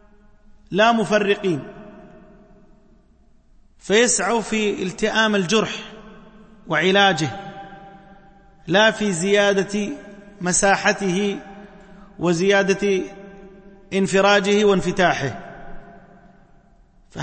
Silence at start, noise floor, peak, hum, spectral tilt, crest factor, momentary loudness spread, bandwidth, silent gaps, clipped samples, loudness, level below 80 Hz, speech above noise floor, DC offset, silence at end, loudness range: 0.7 s; -54 dBFS; -4 dBFS; none; -3.5 dB/octave; 18 dB; 21 LU; 8.8 kHz; none; under 0.1%; -19 LUFS; -48 dBFS; 35 dB; under 0.1%; 0 s; 4 LU